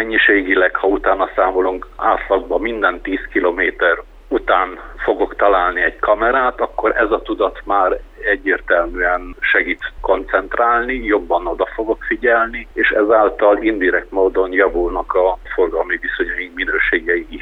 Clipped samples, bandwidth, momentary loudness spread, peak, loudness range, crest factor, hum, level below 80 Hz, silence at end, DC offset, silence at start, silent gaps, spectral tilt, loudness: under 0.1%; 4.5 kHz; 7 LU; 0 dBFS; 2 LU; 16 dB; none; -36 dBFS; 0 s; under 0.1%; 0 s; none; -6.5 dB/octave; -16 LUFS